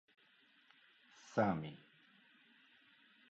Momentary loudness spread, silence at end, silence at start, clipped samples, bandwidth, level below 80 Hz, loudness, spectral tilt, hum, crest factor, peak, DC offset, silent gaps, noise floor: 25 LU; 1.55 s; 1.25 s; under 0.1%; 7.6 kHz; -76 dBFS; -39 LUFS; -6 dB/octave; none; 24 dB; -20 dBFS; under 0.1%; none; -71 dBFS